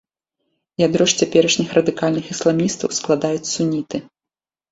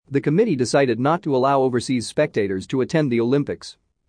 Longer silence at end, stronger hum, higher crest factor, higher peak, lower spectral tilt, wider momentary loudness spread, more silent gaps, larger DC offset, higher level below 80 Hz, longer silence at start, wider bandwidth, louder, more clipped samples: first, 0.7 s vs 0.35 s; neither; about the same, 18 dB vs 16 dB; about the same, -2 dBFS vs -4 dBFS; second, -4 dB/octave vs -6 dB/octave; first, 8 LU vs 5 LU; neither; neither; about the same, -58 dBFS vs -60 dBFS; first, 0.8 s vs 0.1 s; second, 8 kHz vs 10.5 kHz; about the same, -18 LUFS vs -20 LUFS; neither